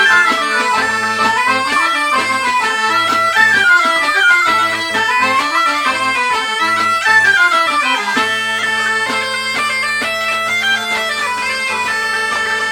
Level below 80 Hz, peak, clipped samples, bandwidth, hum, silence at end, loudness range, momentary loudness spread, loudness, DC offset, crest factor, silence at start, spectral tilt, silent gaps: -56 dBFS; 0 dBFS; under 0.1%; 20 kHz; none; 0 s; 4 LU; 6 LU; -13 LUFS; under 0.1%; 14 dB; 0 s; -1 dB/octave; none